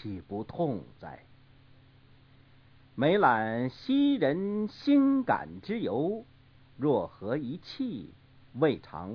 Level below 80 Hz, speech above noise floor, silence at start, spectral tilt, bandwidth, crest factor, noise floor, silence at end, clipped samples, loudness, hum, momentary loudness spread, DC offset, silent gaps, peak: -64 dBFS; 29 dB; 0 s; -8.5 dB/octave; 5.4 kHz; 20 dB; -58 dBFS; 0 s; under 0.1%; -29 LUFS; none; 16 LU; under 0.1%; none; -10 dBFS